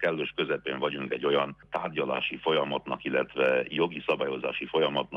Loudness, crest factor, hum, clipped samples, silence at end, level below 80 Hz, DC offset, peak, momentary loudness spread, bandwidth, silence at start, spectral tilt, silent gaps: -29 LUFS; 16 dB; none; under 0.1%; 0 s; -66 dBFS; under 0.1%; -12 dBFS; 6 LU; 6 kHz; 0 s; -7 dB/octave; none